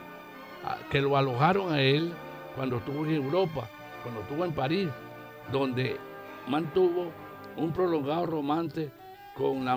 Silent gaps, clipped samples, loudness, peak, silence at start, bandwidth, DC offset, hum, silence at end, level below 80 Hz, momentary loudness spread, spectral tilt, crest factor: none; under 0.1%; -29 LUFS; -10 dBFS; 0 s; 15.5 kHz; under 0.1%; none; 0 s; -62 dBFS; 17 LU; -7.5 dB/octave; 20 dB